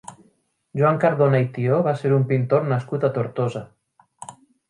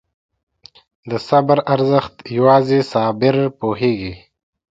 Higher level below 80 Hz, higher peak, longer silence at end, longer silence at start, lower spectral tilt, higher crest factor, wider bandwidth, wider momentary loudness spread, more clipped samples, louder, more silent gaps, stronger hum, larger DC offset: second, -66 dBFS vs -52 dBFS; second, -4 dBFS vs 0 dBFS; second, 0.35 s vs 0.55 s; second, 0.1 s vs 1.05 s; about the same, -8.5 dB/octave vs -8 dB/octave; about the same, 18 dB vs 18 dB; first, 11 kHz vs 7.8 kHz; first, 20 LU vs 12 LU; neither; second, -21 LUFS vs -16 LUFS; neither; neither; neither